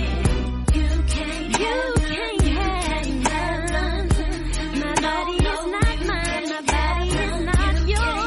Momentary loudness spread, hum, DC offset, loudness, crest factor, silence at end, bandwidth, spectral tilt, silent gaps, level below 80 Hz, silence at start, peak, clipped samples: 3 LU; none; under 0.1%; -23 LUFS; 16 dB; 0 s; 11.5 kHz; -5 dB/octave; none; -24 dBFS; 0 s; -6 dBFS; under 0.1%